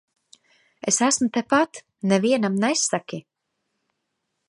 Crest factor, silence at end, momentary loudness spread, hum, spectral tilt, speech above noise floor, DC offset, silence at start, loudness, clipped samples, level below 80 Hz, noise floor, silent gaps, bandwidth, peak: 20 dB; 1.3 s; 11 LU; none; -3.5 dB/octave; 56 dB; under 0.1%; 0.85 s; -22 LUFS; under 0.1%; -70 dBFS; -78 dBFS; none; 11.5 kHz; -4 dBFS